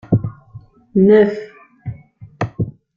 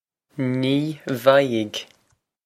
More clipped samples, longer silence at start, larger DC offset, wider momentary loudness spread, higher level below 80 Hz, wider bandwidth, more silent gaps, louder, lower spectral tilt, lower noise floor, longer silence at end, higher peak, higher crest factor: neither; second, 0.1 s vs 0.35 s; neither; first, 22 LU vs 13 LU; first, -46 dBFS vs -68 dBFS; second, 6.6 kHz vs 15.5 kHz; neither; first, -16 LUFS vs -21 LUFS; first, -9.5 dB/octave vs -6 dB/octave; second, -41 dBFS vs -67 dBFS; second, 0.25 s vs 0.6 s; about the same, -2 dBFS vs 0 dBFS; second, 16 dB vs 22 dB